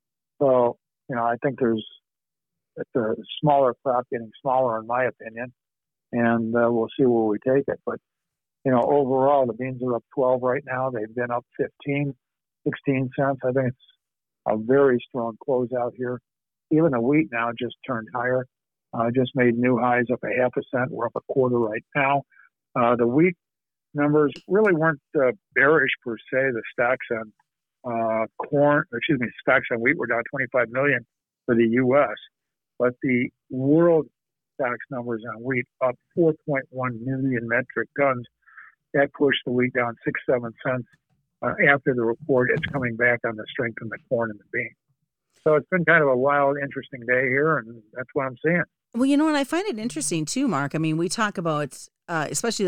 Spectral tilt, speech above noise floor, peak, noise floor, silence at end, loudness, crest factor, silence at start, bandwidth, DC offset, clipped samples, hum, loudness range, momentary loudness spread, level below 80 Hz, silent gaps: -6 dB/octave; over 67 dB; -4 dBFS; under -90 dBFS; 0 s; -23 LUFS; 20 dB; 0.4 s; 15.5 kHz; under 0.1%; under 0.1%; none; 4 LU; 11 LU; -66 dBFS; none